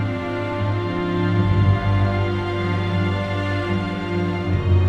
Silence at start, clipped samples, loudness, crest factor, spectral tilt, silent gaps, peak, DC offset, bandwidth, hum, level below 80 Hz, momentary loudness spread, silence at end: 0 s; under 0.1%; -21 LUFS; 14 dB; -8 dB/octave; none; -6 dBFS; under 0.1%; 6.6 kHz; none; -36 dBFS; 6 LU; 0 s